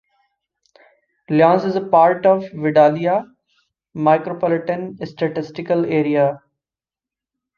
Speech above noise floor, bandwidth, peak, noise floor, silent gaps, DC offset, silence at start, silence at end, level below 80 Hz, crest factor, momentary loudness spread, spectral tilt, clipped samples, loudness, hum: over 73 dB; 6.8 kHz; -2 dBFS; under -90 dBFS; none; under 0.1%; 1.3 s; 1.2 s; -64 dBFS; 18 dB; 11 LU; -8.5 dB/octave; under 0.1%; -17 LUFS; none